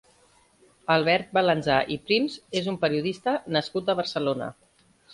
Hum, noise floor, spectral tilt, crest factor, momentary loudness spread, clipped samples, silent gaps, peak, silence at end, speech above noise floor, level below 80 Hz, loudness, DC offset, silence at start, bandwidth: none; -60 dBFS; -5.5 dB/octave; 20 dB; 7 LU; under 0.1%; none; -6 dBFS; 0 s; 36 dB; -62 dBFS; -25 LUFS; under 0.1%; 0.9 s; 11.5 kHz